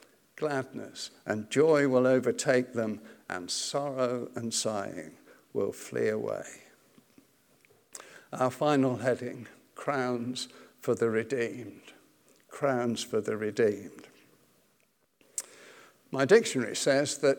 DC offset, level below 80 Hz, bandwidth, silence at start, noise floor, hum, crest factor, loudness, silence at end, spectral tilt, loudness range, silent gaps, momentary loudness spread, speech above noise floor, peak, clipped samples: under 0.1%; -82 dBFS; 19 kHz; 0.4 s; -71 dBFS; none; 22 dB; -30 LUFS; 0 s; -4.5 dB/octave; 7 LU; none; 20 LU; 42 dB; -8 dBFS; under 0.1%